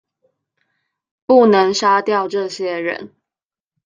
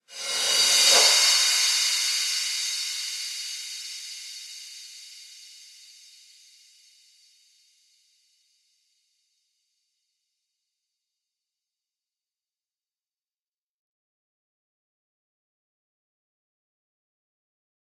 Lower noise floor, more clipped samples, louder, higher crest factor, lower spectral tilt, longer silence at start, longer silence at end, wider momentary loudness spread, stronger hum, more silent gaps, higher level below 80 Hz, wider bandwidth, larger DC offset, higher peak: about the same, -90 dBFS vs under -90 dBFS; neither; first, -15 LUFS vs -20 LUFS; second, 16 dB vs 26 dB; first, -4.5 dB/octave vs 4 dB/octave; first, 1.3 s vs 0.1 s; second, 0.8 s vs 12.35 s; second, 13 LU vs 25 LU; neither; neither; first, -64 dBFS vs under -90 dBFS; second, 9.4 kHz vs 16.5 kHz; neither; about the same, -2 dBFS vs -4 dBFS